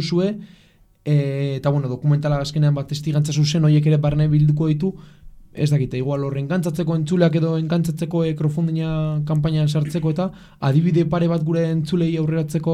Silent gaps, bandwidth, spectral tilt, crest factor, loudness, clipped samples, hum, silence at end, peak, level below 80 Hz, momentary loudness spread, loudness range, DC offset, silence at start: none; 11.5 kHz; -7.5 dB/octave; 16 dB; -20 LUFS; under 0.1%; none; 0 s; -2 dBFS; -46 dBFS; 6 LU; 3 LU; under 0.1%; 0 s